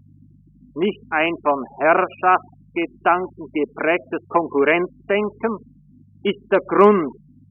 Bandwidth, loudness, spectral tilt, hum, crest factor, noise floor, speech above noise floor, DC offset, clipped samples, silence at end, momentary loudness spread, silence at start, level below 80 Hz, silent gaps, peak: 3.8 kHz; -20 LUFS; -0.5 dB/octave; 50 Hz at -55 dBFS; 20 dB; -50 dBFS; 31 dB; under 0.1%; under 0.1%; 0.4 s; 11 LU; 0.75 s; -58 dBFS; none; 0 dBFS